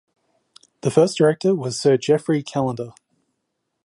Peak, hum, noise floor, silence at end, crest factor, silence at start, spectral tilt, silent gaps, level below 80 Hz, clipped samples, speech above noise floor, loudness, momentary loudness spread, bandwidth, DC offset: -4 dBFS; none; -76 dBFS; 0.95 s; 18 dB; 0.85 s; -6 dB/octave; none; -64 dBFS; under 0.1%; 57 dB; -20 LUFS; 10 LU; 11.5 kHz; under 0.1%